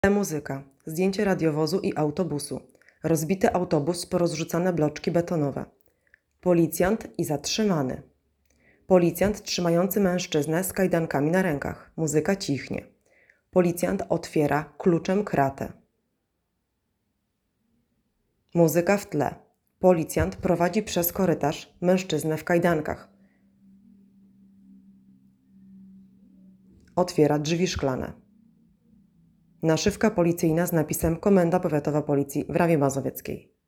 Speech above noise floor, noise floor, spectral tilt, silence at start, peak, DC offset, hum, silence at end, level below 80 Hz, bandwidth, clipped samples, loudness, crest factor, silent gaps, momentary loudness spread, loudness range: 53 dB; -77 dBFS; -6 dB/octave; 0.05 s; -6 dBFS; under 0.1%; none; 0.25 s; -52 dBFS; 18 kHz; under 0.1%; -25 LUFS; 20 dB; none; 10 LU; 6 LU